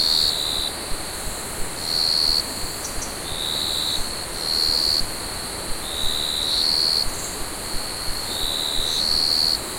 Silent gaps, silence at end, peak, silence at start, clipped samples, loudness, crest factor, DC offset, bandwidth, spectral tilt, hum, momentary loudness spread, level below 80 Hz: none; 0 s; -6 dBFS; 0 s; under 0.1%; -21 LUFS; 16 dB; under 0.1%; 16.5 kHz; -1 dB/octave; none; 11 LU; -38 dBFS